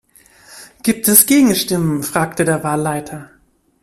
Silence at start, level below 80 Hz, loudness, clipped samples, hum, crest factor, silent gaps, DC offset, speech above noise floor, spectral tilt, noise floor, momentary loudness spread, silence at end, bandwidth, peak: 0.5 s; -52 dBFS; -14 LUFS; under 0.1%; none; 16 dB; none; under 0.1%; 32 dB; -4 dB/octave; -47 dBFS; 14 LU; 0.55 s; 16 kHz; 0 dBFS